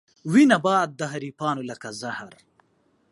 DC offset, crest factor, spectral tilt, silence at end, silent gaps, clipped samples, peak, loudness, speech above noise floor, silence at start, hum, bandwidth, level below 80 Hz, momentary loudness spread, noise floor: under 0.1%; 20 dB; -5.5 dB/octave; 0.8 s; none; under 0.1%; -4 dBFS; -23 LUFS; 43 dB; 0.25 s; none; 11.5 kHz; -72 dBFS; 16 LU; -66 dBFS